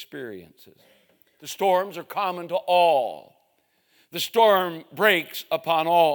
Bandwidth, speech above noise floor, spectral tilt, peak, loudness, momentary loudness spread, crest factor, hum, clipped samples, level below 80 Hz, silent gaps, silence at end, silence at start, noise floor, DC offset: 19.5 kHz; 45 dB; -3.5 dB/octave; -4 dBFS; -22 LUFS; 18 LU; 20 dB; none; under 0.1%; -80 dBFS; none; 0 s; 0 s; -68 dBFS; under 0.1%